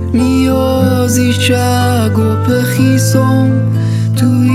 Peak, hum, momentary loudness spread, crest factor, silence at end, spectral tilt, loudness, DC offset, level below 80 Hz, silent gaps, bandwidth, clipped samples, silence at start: 0 dBFS; none; 2 LU; 10 dB; 0 s; -6 dB/octave; -11 LUFS; under 0.1%; -40 dBFS; none; 15.5 kHz; under 0.1%; 0 s